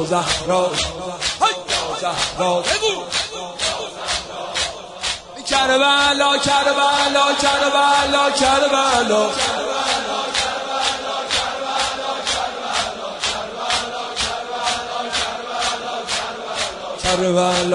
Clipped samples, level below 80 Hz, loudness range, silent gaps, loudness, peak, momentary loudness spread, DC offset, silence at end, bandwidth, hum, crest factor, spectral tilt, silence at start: under 0.1%; -46 dBFS; 7 LU; none; -18 LUFS; -4 dBFS; 9 LU; under 0.1%; 0 s; 11 kHz; none; 16 dB; -2 dB/octave; 0 s